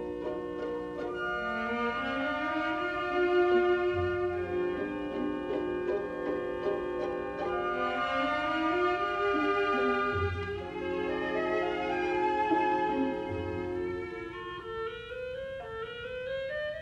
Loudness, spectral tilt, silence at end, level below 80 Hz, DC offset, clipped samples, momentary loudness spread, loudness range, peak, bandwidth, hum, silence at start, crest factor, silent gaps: -31 LUFS; -6.5 dB/octave; 0 s; -56 dBFS; under 0.1%; under 0.1%; 10 LU; 4 LU; -16 dBFS; 7.8 kHz; none; 0 s; 16 dB; none